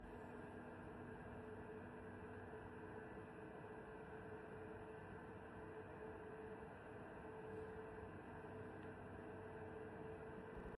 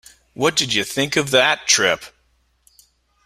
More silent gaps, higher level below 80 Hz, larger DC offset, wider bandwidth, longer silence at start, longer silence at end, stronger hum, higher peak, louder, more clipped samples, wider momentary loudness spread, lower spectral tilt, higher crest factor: neither; second, -70 dBFS vs -56 dBFS; neither; second, 11.5 kHz vs 16 kHz; second, 0 s vs 0.4 s; second, 0 s vs 1.2 s; neither; second, -42 dBFS vs 0 dBFS; second, -55 LUFS vs -17 LUFS; neither; second, 2 LU vs 5 LU; first, -8 dB/octave vs -2 dB/octave; second, 12 dB vs 20 dB